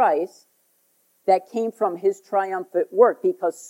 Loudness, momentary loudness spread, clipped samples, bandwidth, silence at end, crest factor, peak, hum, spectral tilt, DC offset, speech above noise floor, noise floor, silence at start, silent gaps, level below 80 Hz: -22 LUFS; 9 LU; under 0.1%; 16 kHz; 0 s; 18 dB; -4 dBFS; none; -5.5 dB/octave; under 0.1%; 43 dB; -65 dBFS; 0 s; none; under -90 dBFS